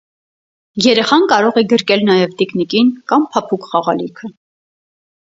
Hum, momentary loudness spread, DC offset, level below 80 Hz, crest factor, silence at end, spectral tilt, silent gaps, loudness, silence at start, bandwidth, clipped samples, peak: none; 11 LU; under 0.1%; -60 dBFS; 16 dB; 1 s; -5 dB/octave; none; -14 LUFS; 0.75 s; 7.8 kHz; under 0.1%; 0 dBFS